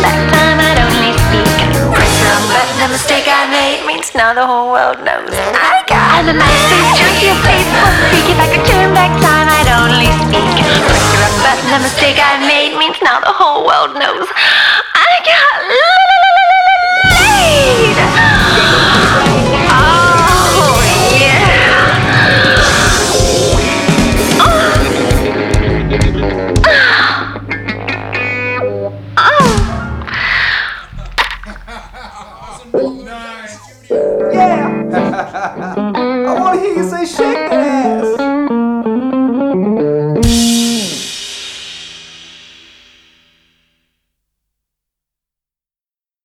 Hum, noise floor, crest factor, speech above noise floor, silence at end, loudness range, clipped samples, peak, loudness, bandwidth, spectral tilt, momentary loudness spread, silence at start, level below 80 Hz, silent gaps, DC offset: none; under -90 dBFS; 10 dB; over 81 dB; 3.95 s; 9 LU; under 0.1%; 0 dBFS; -9 LUFS; 19.5 kHz; -4 dB/octave; 11 LU; 0 s; -24 dBFS; none; under 0.1%